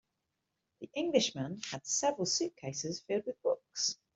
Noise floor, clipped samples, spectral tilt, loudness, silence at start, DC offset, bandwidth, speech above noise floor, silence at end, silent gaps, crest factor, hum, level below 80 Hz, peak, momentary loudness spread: -85 dBFS; under 0.1%; -3 dB/octave; -34 LUFS; 0.8 s; under 0.1%; 8.2 kHz; 50 dB; 0.2 s; none; 22 dB; none; -76 dBFS; -14 dBFS; 9 LU